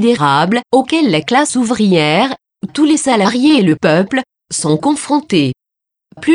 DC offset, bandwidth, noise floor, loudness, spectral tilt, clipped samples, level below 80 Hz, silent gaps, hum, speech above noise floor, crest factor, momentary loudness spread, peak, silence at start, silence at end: under 0.1%; 11 kHz; -81 dBFS; -13 LUFS; -4.5 dB/octave; under 0.1%; -56 dBFS; none; none; 69 dB; 12 dB; 9 LU; 0 dBFS; 0 s; 0 s